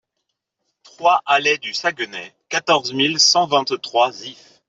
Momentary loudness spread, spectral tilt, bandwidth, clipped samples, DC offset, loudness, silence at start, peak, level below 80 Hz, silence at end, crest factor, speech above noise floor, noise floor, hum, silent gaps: 14 LU; -1.5 dB/octave; 8 kHz; under 0.1%; under 0.1%; -17 LUFS; 1 s; -2 dBFS; -70 dBFS; 0.35 s; 18 dB; 58 dB; -77 dBFS; none; none